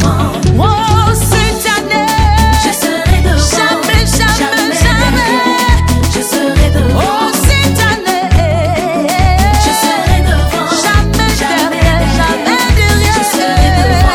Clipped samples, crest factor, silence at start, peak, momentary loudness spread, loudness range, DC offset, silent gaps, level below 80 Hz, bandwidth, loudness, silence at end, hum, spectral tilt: 0.3%; 10 dB; 0 s; 0 dBFS; 3 LU; 1 LU; under 0.1%; none; -16 dBFS; 18.5 kHz; -10 LUFS; 0 s; none; -4.5 dB/octave